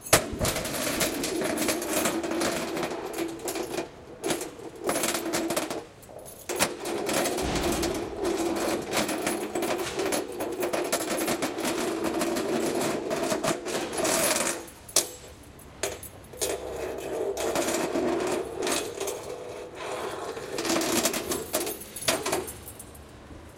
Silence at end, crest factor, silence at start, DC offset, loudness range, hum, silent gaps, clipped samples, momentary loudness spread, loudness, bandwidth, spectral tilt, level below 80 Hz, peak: 0 s; 26 dB; 0 s; under 0.1%; 3 LU; none; none; under 0.1%; 12 LU; -29 LUFS; 17 kHz; -2.5 dB/octave; -50 dBFS; -4 dBFS